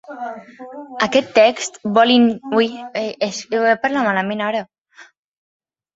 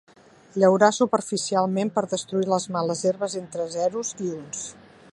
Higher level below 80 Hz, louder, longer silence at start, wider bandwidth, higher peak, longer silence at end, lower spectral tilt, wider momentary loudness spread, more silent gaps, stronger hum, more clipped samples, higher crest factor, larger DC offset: first, -62 dBFS vs -70 dBFS; first, -17 LUFS vs -24 LUFS; second, 0.1 s vs 0.55 s; second, 8 kHz vs 11.5 kHz; about the same, 0 dBFS vs -2 dBFS; first, 0.9 s vs 0.4 s; about the same, -4 dB/octave vs -4.5 dB/octave; first, 17 LU vs 13 LU; first, 4.78-4.84 s vs none; neither; neither; about the same, 18 dB vs 22 dB; neither